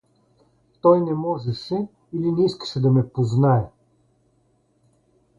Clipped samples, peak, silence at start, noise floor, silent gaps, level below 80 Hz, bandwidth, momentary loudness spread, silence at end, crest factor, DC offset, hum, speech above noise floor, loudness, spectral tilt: under 0.1%; -4 dBFS; 0.85 s; -64 dBFS; none; -56 dBFS; 7.6 kHz; 10 LU; 1.7 s; 18 dB; under 0.1%; none; 44 dB; -21 LUFS; -8.5 dB/octave